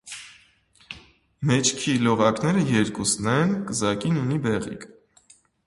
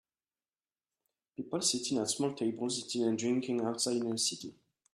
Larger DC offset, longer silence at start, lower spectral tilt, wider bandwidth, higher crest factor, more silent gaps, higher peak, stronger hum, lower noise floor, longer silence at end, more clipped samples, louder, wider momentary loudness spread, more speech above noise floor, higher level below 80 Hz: neither; second, 0.05 s vs 1.4 s; about the same, -4.5 dB/octave vs -3.5 dB/octave; second, 11.5 kHz vs 14 kHz; about the same, 20 dB vs 20 dB; neither; first, -4 dBFS vs -16 dBFS; neither; second, -58 dBFS vs under -90 dBFS; first, 0.8 s vs 0.45 s; neither; first, -23 LUFS vs -33 LUFS; first, 19 LU vs 11 LU; second, 36 dB vs over 57 dB; first, -56 dBFS vs -78 dBFS